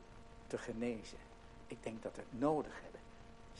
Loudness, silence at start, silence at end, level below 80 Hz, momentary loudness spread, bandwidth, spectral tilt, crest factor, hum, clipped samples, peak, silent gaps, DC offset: -43 LUFS; 0 s; 0 s; -60 dBFS; 22 LU; 11.5 kHz; -6 dB/octave; 22 dB; none; under 0.1%; -22 dBFS; none; under 0.1%